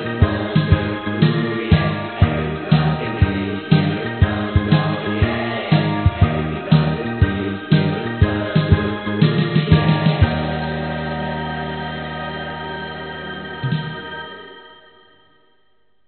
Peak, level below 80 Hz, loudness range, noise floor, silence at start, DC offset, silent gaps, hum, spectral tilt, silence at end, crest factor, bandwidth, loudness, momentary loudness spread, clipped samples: 0 dBFS; -32 dBFS; 9 LU; -65 dBFS; 0 s; 0.1%; none; none; -6 dB/octave; 1.35 s; 18 dB; 4.5 kHz; -19 LUFS; 11 LU; under 0.1%